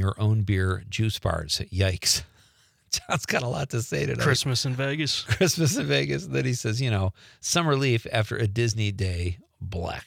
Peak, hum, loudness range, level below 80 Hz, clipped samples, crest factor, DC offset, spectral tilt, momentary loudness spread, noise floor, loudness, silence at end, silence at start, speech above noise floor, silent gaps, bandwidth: -6 dBFS; none; 2 LU; -50 dBFS; under 0.1%; 20 dB; under 0.1%; -4.5 dB/octave; 7 LU; -61 dBFS; -25 LUFS; 0.05 s; 0 s; 36 dB; none; 16.5 kHz